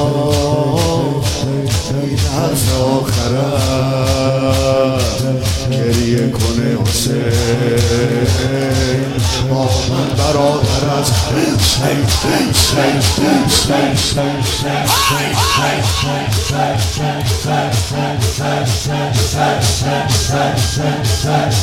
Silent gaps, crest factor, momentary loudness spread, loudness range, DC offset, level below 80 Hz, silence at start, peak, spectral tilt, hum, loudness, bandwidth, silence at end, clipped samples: none; 14 dB; 4 LU; 3 LU; under 0.1%; -30 dBFS; 0 s; 0 dBFS; -4.5 dB/octave; none; -14 LUFS; 16.5 kHz; 0 s; under 0.1%